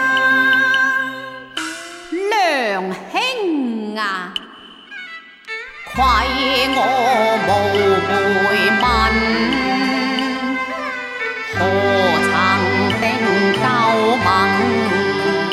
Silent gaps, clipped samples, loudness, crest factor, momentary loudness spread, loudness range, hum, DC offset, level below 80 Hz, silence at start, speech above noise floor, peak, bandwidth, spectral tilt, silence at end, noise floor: none; under 0.1%; -16 LUFS; 16 dB; 13 LU; 6 LU; none; under 0.1%; -38 dBFS; 0 s; 24 dB; -2 dBFS; 15.5 kHz; -4.5 dB/octave; 0 s; -39 dBFS